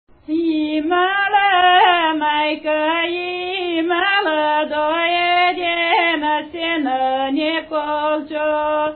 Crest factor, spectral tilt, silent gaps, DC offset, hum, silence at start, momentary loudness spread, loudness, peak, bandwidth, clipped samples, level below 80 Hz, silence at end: 16 dB; -8 dB/octave; none; under 0.1%; none; 0.3 s; 8 LU; -17 LUFS; -2 dBFS; 4.5 kHz; under 0.1%; -56 dBFS; 0 s